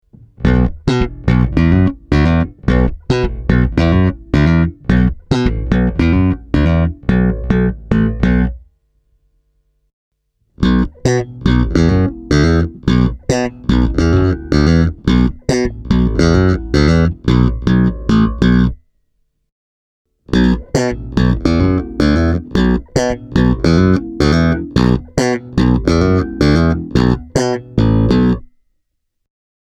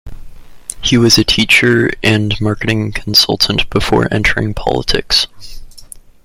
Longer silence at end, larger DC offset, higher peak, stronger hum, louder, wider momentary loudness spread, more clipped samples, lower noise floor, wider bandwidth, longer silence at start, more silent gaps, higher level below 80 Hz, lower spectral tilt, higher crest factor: first, 1.35 s vs 0.25 s; neither; about the same, 0 dBFS vs 0 dBFS; neither; about the same, -14 LUFS vs -12 LUFS; second, 5 LU vs 8 LU; neither; first, -69 dBFS vs -35 dBFS; second, 9.8 kHz vs 16.5 kHz; first, 0.4 s vs 0.05 s; first, 9.93-10.11 s, 19.52-20.05 s vs none; first, -22 dBFS vs -30 dBFS; first, -7 dB/octave vs -4 dB/octave; about the same, 14 dB vs 14 dB